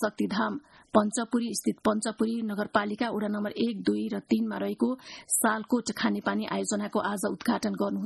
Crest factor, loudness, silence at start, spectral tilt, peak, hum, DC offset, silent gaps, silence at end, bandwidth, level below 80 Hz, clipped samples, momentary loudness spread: 20 dB; -29 LUFS; 0 s; -4 dB/octave; -8 dBFS; none; under 0.1%; none; 0 s; 12.5 kHz; -66 dBFS; under 0.1%; 5 LU